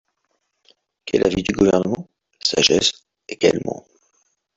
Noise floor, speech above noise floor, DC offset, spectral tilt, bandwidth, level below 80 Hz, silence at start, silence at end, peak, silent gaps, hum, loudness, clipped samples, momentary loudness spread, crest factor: -71 dBFS; 53 dB; under 0.1%; -3.5 dB/octave; 8.2 kHz; -48 dBFS; 1.05 s; 0.8 s; -2 dBFS; none; none; -19 LUFS; under 0.1%; 19 LU; 20 dB